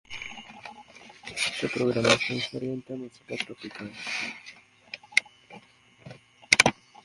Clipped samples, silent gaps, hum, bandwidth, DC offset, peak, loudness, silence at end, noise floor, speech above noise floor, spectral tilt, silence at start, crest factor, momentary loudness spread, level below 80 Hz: under 0.1%; none; none; 12 kHz; under 0.1%; -2 dBFS; -26 LUFS; 0.3 s; -54 dBFS; 25 dB; -2.5 dB/octave; 0.1 s; 30 dB; 22 LU; -64 dBFS